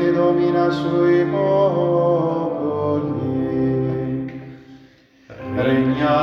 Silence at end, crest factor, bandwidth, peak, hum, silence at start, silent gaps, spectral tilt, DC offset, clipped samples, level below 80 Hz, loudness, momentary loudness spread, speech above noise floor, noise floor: 0 s; 14 dB; 6.2 kHz; -6 dBFS; none; 0 s; none; -9 dB/octave; under 0.1%; under 0.1%; -50 dBFS; -19 LUFS; 10 LU; 33 dB; -50 dBFS